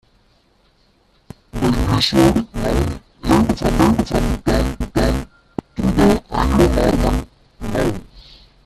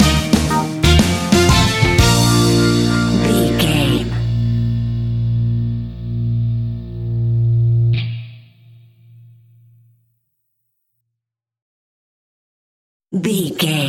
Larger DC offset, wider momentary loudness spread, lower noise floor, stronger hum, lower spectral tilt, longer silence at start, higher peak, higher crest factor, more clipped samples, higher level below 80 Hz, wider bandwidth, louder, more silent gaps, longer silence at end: neither; about the same, 12 LU vs 10 LU; second, -57 dBFS vs -82 dBFS; neither; about the same, -6 dB/octave vs -5 dB/octave; first, 1.55 s vs 0 s; about the same, 0 dBFS vs 0 dBFS; about the same, 18 dB vs 16 dB; neither; about the same, -26 dBFS vs -28 dBFS; second, 14.5 kHz vs 16 kHz; about the same, -17 LUFS vs -16 LUFS; second, none vs 11.62-13.00 s; first, 0.45 s vs 0 s